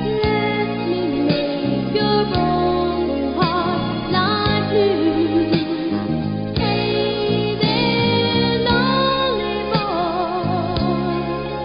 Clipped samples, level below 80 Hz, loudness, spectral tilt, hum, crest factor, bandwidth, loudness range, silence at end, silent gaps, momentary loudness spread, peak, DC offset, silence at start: under 0.1%; -38 dBFS; -19 LUFS; -11 dB/octave; none; 16 dB; 5.4 kHz; 1 LU; 0 s; none; 5 LU; -2 dBFS; under 0.1%; 0 s